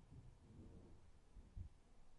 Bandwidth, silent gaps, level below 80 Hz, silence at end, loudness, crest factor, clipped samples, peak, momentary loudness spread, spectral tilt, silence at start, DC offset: 10.5 kHz; none; -64 dBFS; 0 s; -63 LUFS; 18 dB; under 0.1%; -42 dBFS; 8 LU; -7.5 dB/octave; 0 s; under 0.1%